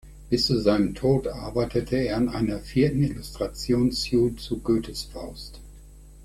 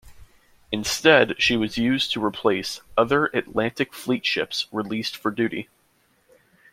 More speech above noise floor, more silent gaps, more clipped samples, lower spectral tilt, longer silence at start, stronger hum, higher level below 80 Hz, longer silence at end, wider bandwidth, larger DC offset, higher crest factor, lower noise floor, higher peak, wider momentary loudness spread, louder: second, 22 dB vs 41 dB; neither; neither; first, -6.5 dB/octave vs -4 dB/octave; about the same, 0.05 s vs 0.05 s; neither; first, -42 dBFS vs -56 dBFS; second, 0 s vs 1.1 s; about the same, 15 kHz vs 16.5 kHz; neither; about the same, 18 dB vs 22 dB; second, -46 dBFS vs -64 dBFS; second, -8 dBFS vs -2 dBFS; about the same, 12 LU vs 11 LU; second, -25 LUFS vs -22 LUFS